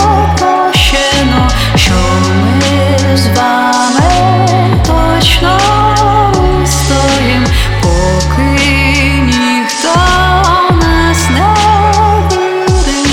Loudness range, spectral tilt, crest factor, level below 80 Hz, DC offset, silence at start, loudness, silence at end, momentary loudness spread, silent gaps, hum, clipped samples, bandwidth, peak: 1 LU; -4.5 dB/octave; 8 dB; -16 dBFS; under 0.1%; 0 s; -9 LUFS; 0 s; 3 LU; none; none; under 0.1%; 17.5 kHz; 0 dBFS